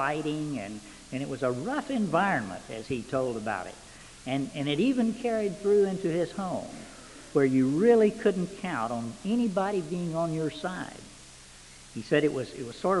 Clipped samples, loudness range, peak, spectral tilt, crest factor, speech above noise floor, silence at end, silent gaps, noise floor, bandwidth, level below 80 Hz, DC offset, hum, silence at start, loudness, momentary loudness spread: under 0.1%; 5 LU; -10 dBFS; -6 dB/octave; 18 dB; 22 dB; 0 s; none; -50 dBFS; 11.5 kHz; -58 dBFS; under 0.1%; none; 0 s; -29 LUFS; 19 LU